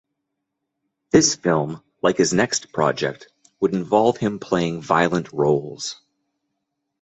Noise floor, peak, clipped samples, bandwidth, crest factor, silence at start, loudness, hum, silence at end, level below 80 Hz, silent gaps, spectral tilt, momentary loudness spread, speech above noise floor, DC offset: -79 dBFS; -2 dBFS; under 0.1%; 8.2 kHz; 20 dB; 1.15 s; -21 LUFS; none; 1.1 s; -56 dBFS; none; -4 dB/octave; 10 LU; 59 dB; under 0.1%